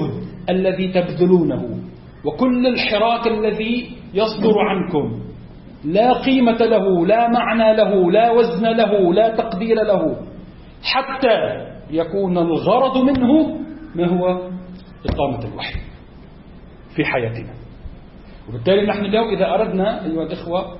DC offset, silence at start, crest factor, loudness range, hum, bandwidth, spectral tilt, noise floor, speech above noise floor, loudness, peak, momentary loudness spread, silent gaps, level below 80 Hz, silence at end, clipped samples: under 0.1%; 0 s; 16 dB; 9 LU; none; 5.8 kHz; -11 dB/octave; -40 dBFS; 24 dB; -18 LUFS; -2 dBFS; 14 LU; none; -40 dBFS; 0 s; under 0.1%